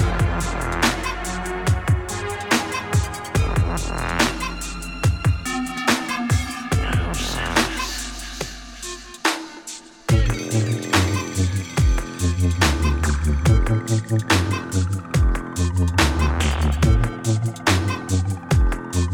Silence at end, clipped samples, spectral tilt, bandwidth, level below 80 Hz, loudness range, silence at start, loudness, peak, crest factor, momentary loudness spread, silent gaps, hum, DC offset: 0 s; under 0.1%; -5 dB/octave; 18.5 kHz; -26 dBFS; 4 LU; 0 s; -22 LUFS; -2 dBFS; 18 dB; 8 LU; none; none; under 0.1%